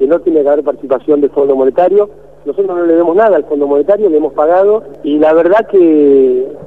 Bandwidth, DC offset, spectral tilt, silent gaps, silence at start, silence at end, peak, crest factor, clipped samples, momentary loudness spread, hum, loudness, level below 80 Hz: 4 kHz; 0.9%; -8.5 dB/octave; none; 0 s; 0 s; 0 dBFS; 10 dB; under 0.1%; 8 LU; none; -10 LUFS; -48 dBFS